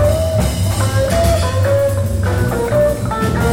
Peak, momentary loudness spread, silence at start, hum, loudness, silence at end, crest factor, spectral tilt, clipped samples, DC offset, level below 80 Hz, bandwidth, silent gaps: -2 dBFS; 3 LU; 0 s; none; -16 LUFS; 0 s; 12 dB; -6 dB/octave; under 0.1%; under 0.1%; -24 dBFS; 17 kHz; none